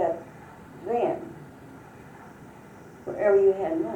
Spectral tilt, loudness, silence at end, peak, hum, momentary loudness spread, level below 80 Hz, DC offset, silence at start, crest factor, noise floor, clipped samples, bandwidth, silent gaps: -7.5 dB/octave; -25 LUFS; 0 s; -10 dBFS; none; 26 LU; -64 dBFS; under 0.1%; 0 s; 18 dB; -47 dBFS; under 0.1%; 8.6 kHz; none